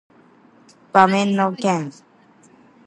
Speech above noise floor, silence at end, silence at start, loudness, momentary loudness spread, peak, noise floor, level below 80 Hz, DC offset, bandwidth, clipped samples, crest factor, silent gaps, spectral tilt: 35 dB; 0.95 s; 0.95 s; -18 LUFS; 9 LU; 0 dBFS; -52 dBFS; -70 dBFS; under 0.1%; 11 kHz; under 0.1%; 22 dB; none; -5.5 dB/octave